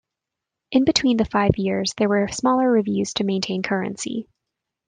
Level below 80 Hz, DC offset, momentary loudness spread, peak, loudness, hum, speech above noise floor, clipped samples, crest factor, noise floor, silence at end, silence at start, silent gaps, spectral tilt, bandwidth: -48 dBFS; under 0.1%; 7 LU; -2 dBFS; -21 LUFS; none; 64 dB; under 0.1%; 20 dB; -85 dBFS; 0.65 s; 0.7 s; none; -5 dB/octave; 9.8 kHz